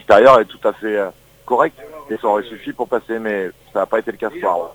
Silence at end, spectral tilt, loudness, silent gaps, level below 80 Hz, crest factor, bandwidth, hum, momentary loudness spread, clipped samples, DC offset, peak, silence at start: 0 s; -5.5 dB/octave; -18 LUFS; none; -54 dBFS; 18 dB; 19.5 kHz; none; 15 LU; 0.1%; under 0.1%; 0 dBFS; 0.1 s